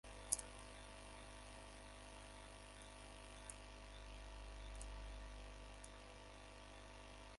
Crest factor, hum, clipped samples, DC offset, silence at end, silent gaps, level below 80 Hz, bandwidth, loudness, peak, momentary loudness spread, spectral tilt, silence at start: 38 dB; 50 Hz at -60 dBFS; under 0.1%; under 0.1%; 0 s; none; -58 dBFS; 11.5 kHz; -54 LUFS; -16 dBFS; 10 LU; -2.5 dB/octave; 0.05 s